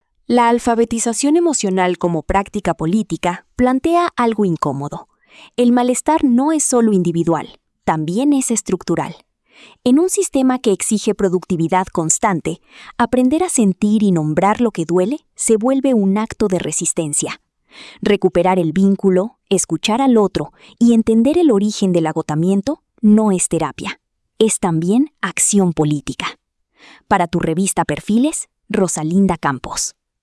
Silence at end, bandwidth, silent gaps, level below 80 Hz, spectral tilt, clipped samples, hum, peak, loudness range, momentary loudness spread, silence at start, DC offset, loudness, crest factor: 0.35 s; 12 kHz; none; -44 dBFS; -5 dB/octave; under 0.1%; none; -2 dBFS; 3 LU; 8 LU; 0.3 s; under 0.1%; -16 LUFS; 14 dB